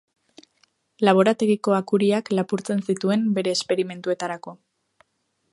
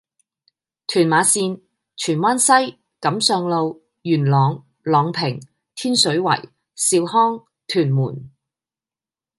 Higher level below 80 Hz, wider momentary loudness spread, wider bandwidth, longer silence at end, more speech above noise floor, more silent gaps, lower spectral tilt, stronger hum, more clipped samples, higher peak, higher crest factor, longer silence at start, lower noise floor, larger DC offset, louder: about the same, -72 dBFS vs -68 dBFS; second, 9 LU vs 14 LU; about the same, 11.5 kHz vs 12 kHz; about the same, 1 s vs 1.1 s; second, 51 dB vs over 72 dB; neither; first, -5.5 dB/octave vs -4 dB/octave; neither; neither; about the same, -2 dBFS vs -2 dBFS; about the same, 22 dB vs 18 dB; about the same, 1 s vs 0.9 s; second, -73 dBFS vs under -90 dBFS; neither; second, -22 LUFS vs -18 LUFS